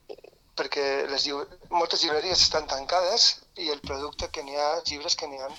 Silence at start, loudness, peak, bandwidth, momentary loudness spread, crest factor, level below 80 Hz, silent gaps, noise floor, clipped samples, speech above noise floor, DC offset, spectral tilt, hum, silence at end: 0.1 s; -25 LUFS; -8 dBFS; 18 kHz; 13 LU; 20 dB; -52 dBFS; none; -47 dBFS; under 0.1%; 20 dB; under 0.1%; -1 dB/octave; none; 0 s